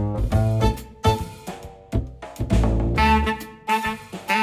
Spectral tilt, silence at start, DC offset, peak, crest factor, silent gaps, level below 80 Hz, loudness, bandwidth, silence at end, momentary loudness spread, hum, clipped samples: -6 dB/octave; 0 s; under 0.1%; -6 dBFS; 16 dB; none; -28 dBFS; -23 LUFS; 16 kHz; 0 s; 15 LU; none; under 0.1%